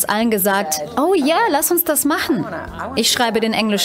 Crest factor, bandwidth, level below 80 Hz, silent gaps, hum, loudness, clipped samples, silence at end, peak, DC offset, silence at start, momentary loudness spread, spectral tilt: 14 dB; 16.5 kHz; -48 dBFS; none; none; -17 LUFS; under 0.1%; 0 s; -4 dBFS; under 0.1%; 0 s; 6 LU; -3 dB/octave